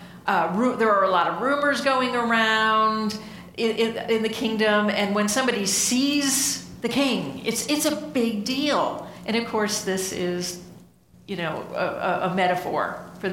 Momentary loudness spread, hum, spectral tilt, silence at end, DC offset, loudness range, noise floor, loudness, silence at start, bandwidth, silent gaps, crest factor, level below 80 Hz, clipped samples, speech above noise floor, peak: 9 LU; none; -3 dB/octave; 0 s; under 0.1%; 5 LU; -52 dBFS; -23 LUFS; 0 s; 17 kHz; none; 16 dB; -60 dBFS; under 0.1%; 29 dB; -6 dBFS